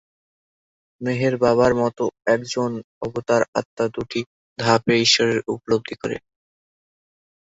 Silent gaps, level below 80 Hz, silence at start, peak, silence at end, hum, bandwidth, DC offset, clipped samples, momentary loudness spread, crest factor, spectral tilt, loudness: 2.84-3.01 s, 3.48-3.53 s, 3.65-3.77 s, 4.26-4.56 s; -56 dBFS; 1 s; -2 dBFS; 1.4 s; none; 8 kHz; under 0.1%; under 0.1%; 13 LU; 20 dB; -4.5 dB/octave; -21 LUFS